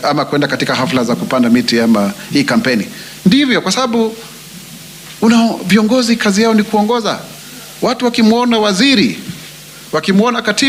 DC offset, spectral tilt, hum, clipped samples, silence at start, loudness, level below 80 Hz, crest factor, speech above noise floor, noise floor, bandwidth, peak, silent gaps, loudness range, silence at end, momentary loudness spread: under 0.1%; -4.5 dB/octave; none; under 0.1%; 0 s; -13 LUFS; -52 dBFS; 14 dB; 21 dB; -33 dBFS; 16 kHz; 0 dBFS; none; 2 LU; 0 s; 19 LU